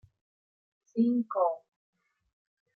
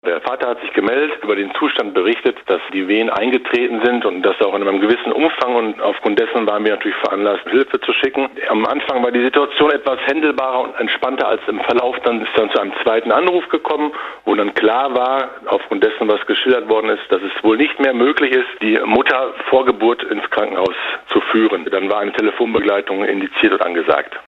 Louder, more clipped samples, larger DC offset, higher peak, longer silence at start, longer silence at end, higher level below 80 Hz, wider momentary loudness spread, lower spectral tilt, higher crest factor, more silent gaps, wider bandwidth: second, -30 LUFS vs -16 LUFS; neither; neither; second, -16 dBFS vs 0 dBFS; first, 0.95 s vs 0.05 s; first, 1.2 s vs 0.05 s; second, -80 dBFS vs -58 dBFS; first, 11 LU vs 5 LU; first, -9.5 dB/octave vs -6 dB/octave; about the same, 18 dB vs 16 dB; neither; second, 4.5 kHz vs 6.8 kHz